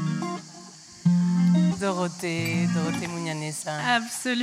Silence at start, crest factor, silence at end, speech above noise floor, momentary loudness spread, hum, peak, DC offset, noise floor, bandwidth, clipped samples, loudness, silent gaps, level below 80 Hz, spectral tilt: 0 s; 16 dB; 0 s; 19 dB; 12 LU; none; -8 dBFS; under 0.1%; -45 dBFS; 14 kHz; under 0.1%; -25 LUFS; none; -66 dBFS; -5.5 dB/octave